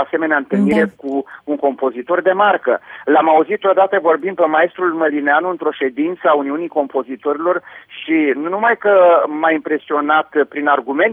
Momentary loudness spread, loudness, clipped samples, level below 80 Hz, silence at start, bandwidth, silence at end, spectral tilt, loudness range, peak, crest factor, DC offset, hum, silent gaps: 9 LU; -16 LUFS; under 0.1%; -64 dBFS; 0 s; 4.9 kHz; 0 s; -7.5 dB/octave; 3 LU; -2 dBFS; 12 dB; under 0.1%; none; none